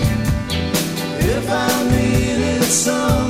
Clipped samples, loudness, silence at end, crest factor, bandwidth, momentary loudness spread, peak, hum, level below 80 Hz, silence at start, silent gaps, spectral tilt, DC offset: under 0.1%; -17 LUFS; 0 s; 14 dB; 16.5 kHz; 5 LU; -4 dBFS; none; -28 dBFS; 0 s; none; -4.5 dB/octave; under 0.1%